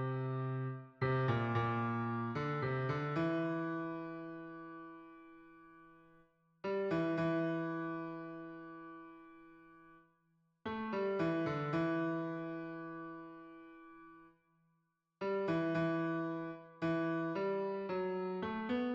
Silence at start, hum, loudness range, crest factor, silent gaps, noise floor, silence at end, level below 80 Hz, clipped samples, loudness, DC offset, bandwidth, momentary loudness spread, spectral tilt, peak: 0 s; none; 9 LU; 16 dB; none; -81 dBFS; 0 s; -72 dBFS; under 0.1%; -38 LUFS; under 0.1%; 7.2 kHz; 20 LU; -9 dB/octave; -24 dBFS